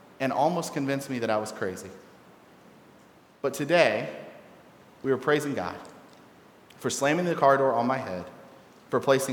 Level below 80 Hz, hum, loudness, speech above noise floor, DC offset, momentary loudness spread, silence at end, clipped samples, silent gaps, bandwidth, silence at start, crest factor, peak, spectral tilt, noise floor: -72 dBFS; none; -27 LUFS; 29 dB; under 0.1%; 18 LU; 0 s; under 0.1%; none; 18.5 kHz; 0.2 s; 24 dB; -4 dBFS; -4.5 dB/octave; -55 dBFS